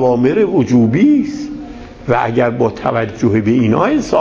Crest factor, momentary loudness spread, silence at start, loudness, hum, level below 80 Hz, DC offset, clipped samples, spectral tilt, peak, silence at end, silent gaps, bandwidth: 14 dB; 14 LU; 0 s; -13 LUFS; none; -40 dBFS; under 0.1%; under 0.1%; -7.5 dB/octave; 0 dBFS; 0 s; none; 7.6 kHz